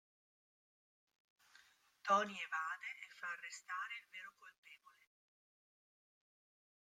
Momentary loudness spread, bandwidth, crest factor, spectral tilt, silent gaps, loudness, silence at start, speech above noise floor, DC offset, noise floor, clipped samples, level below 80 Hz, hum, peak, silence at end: 26 LU; 15.5 kHz; 26 dB; -2.5 dB/octave; 4.58-4.63 s; -42 LUFS; 2.05 s; 27 dB; under 0.1%; -70 dBFS; under 0.1%; under -90 dBFS; none; -22 dBFS; 2.05 s